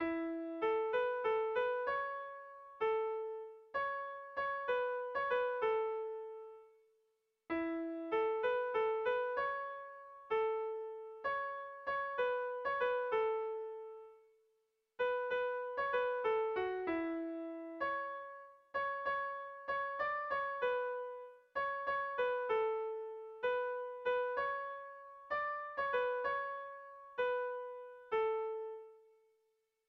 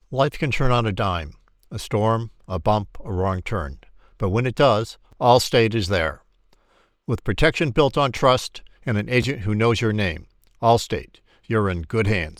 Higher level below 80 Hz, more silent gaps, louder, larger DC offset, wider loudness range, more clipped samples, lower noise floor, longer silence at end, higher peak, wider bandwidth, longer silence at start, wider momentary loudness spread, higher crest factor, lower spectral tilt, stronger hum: second, -76 dBFS vs -38 dBFS; neither; second, -38 LUFS vs -21 LUFS; neither; about the same, 2 LU vs 3 LU; neither; first, -81 dBFS vs -61 dBFS; first, 0.9 s vs 0.05 s; second, -24 dBFS vs -2 dBFS; second, 6 kHz vs 14.5 kHz; about the same, 0 s vs 0.1 s; about the same, 12 LU vs 12 LU; second, 14 dB vs 20 dB; about the same, -5.5 dB/octave vs -6 dB/octave; neither